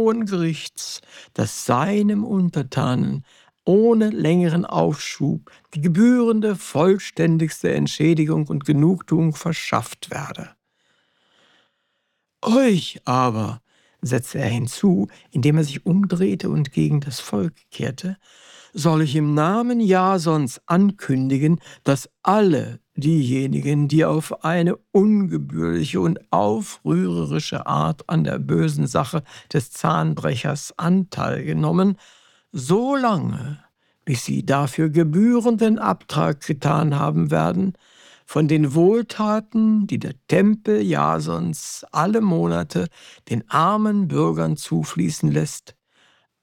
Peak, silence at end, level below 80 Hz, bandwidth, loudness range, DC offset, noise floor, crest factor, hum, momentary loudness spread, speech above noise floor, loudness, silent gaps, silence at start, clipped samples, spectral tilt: -2 dBFS; 0.85 s; -56 dBFS; 15.5 kHz; 4 LU; under 0.1%; -74 dBFS; 18 dB; none; 10 LU; 54 dB; -20 LUFS; none; 0 s; under 0.1%; -6.5 dB/octave